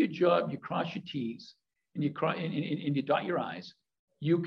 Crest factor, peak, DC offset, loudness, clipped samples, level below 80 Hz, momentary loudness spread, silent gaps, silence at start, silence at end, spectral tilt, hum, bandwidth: 18 dB; -14 dBFS; under 0.1%; -32 LUFS; under 0.1%; -76 dBFS; 17 LU; 3.99-4.08 s; 0 s; 0 s; -8 dB/octave; none; 6.6 kHz